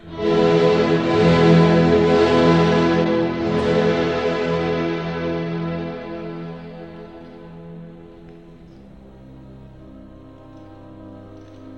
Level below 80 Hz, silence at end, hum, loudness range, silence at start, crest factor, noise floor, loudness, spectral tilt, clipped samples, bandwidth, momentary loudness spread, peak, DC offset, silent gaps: -44 dBFS; 0 s; none; 23 LU; 0.05 s; 16 dB; -43 dBFS; -17 LUFS; -7.5 dB/octave; under 0.1%; 8.2 kHz; 24 LU; -2 dBFS; 0.2%; none